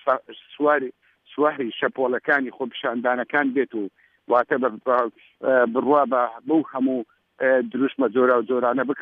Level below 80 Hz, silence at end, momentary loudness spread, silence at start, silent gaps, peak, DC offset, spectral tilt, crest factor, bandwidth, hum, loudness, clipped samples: -78 dBFS; 0 s; 9 LU; 0.05 s; none; -4 dBFS; under 0.1%; -8 dB/octave; 18 dB; 4.6 kHz; none; -22 LUFS; under 0.1%